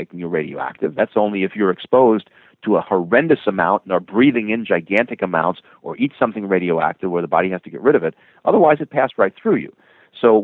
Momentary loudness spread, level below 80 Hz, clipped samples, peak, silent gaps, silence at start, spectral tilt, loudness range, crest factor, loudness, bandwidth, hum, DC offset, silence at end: 9 LU; -62 dBFS; under 0.1%; 0 dBFS; none; 0 s; -9 dB/octave; 3 LU; 18 dB; -18 LUFS; 4.2 kHz; none; under 0.1%; 0 s